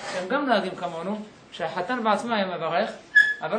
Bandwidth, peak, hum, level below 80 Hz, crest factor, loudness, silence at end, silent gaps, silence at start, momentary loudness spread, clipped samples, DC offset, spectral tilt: 10 kHz; -6 dBFS; none; -70 dBFS; 18 dB; -24 LUFS; 0 s; none; 0 s; 14 LU; under 0.1%; under 0.1%; -4.5 dB/octave